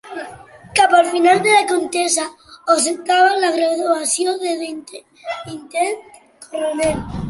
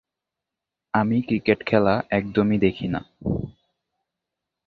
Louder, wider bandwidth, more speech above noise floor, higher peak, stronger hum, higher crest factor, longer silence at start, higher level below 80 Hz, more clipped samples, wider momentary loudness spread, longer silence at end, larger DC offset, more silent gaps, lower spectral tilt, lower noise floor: first, -16 LUFS vs -23 LUFS; first, 11.5 kHz vs 4.9 kHz; second, 22 dB vs 64 dB; about the same, -2 dBFS vs -4 dBFS; neither; second, 16 dB vs 22 dB; second, 0.05 s vs 0.95 s; about the same, -46 dBFS vs -48 dBFS; neither; first, 17 LU vs 9 LU; second, 0 s vs 1.15 s; neither; neither; second, -2.5 dB/octave vs -9.5 dB/octave; second, -39 dBFS vs -86 dBFS